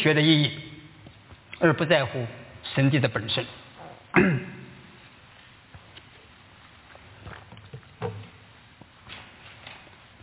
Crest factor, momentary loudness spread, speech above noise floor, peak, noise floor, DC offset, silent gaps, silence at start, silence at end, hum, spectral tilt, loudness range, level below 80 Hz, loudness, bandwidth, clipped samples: 22 dB; 25 LU; 30 dB; -6 dBFS; -52 dBFS; under 0.1%; none; 0 s; 0.45 s; none; -10 dB/octave; 19 LU; -58 dBFS; -24 LUFS; 4 kHz; under 0.1%